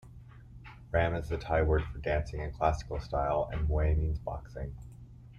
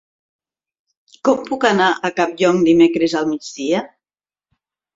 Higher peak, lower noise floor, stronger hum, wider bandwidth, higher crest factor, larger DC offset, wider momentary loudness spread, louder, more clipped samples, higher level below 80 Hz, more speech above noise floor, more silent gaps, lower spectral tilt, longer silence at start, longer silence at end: second, -14 dBFS vs -2 dBFS; second, -51 dBFS vs under -90 dBFS; neither; second, 7 kHz vs 7.8 kHz; about the same, 18 dB vs 18 dB; neither; first, 21 LU vs 9 LU; second, -32 LUFS vs -17 LUFS; neither; first, -38 dBFS vs -60 dBFS; second, 20 dB vs over 74 dB; neither; first, -7.5 dB/octave vs -5 dB/octave; second, 0.05 s vs 1.25 s; second, 0 s vs 1.1 s